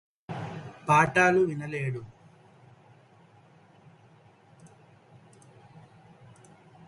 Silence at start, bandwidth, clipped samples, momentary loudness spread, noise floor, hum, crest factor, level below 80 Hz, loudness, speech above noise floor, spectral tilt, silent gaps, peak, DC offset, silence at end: 0.3 s; 11.5 kHz; under 0.1%; 19 LU; -58 dBFS; none; 26 dB; -66 dBFS; -26 LUFS; 33 dB; -6 dB/octave; none; -6 dBFS; under 0.1%; 1.05 s